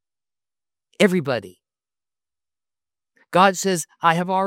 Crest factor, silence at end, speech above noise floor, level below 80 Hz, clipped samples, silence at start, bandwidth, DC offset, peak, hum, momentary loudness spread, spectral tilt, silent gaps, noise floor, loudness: 22 dB; 0 s; over 71 dB; -72 dBFS; under 0.1%; 1 s; 16.5 kHz; under 0.1%; 0 dBFS; none; 8 LU; -4.5 dB/octave; none; under -90 dBFS; -20 LUFS